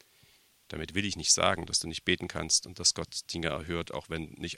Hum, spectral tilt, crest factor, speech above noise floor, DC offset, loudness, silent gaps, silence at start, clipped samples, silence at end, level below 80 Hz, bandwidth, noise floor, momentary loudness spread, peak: none; -2 dB/octave; 24 dB; 32 dB; under 0.1%; -29 LUFS; none; 0.7 s; under 0.1%; 0 s; -54 dBFS; 16.5 kHz; -63 dBFS; 13 LU; -8 dBFS